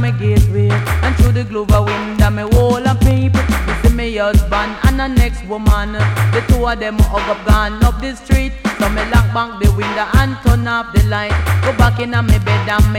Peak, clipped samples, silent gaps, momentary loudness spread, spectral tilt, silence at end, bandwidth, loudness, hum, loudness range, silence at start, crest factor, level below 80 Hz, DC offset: -2 dBFS; under 0.1%; none; 4 LU; -6.5 dB/octave; 0 s; 16.5 kHz; -15 LUFS; none; 1 LU; 0 s; 10 dB; -18 dBFS; under 0.1%